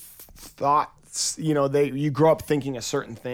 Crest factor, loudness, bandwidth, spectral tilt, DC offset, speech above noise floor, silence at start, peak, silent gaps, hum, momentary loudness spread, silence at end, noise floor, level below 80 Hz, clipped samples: 16 dB; -24 LUFS; 19 kHz; -5 dB/octave; under 0.1%; 23 dB; 0 s; -8 dBFS; none; none; 12 LU; 0 s; -46 dBFS; -56 dBFS; under 0.1%